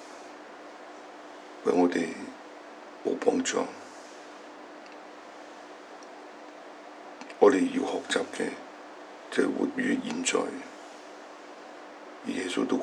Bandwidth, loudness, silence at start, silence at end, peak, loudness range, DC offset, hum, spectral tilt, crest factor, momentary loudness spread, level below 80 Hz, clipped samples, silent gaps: 11.5 kHz; -28 LUFS; 0 s; 0 s; -6 dBFS; 10 LU; under 0.1%; none; -3.5 dB/octave; 26 dB; 20 LU; -88 dBFS; under 0.1%; none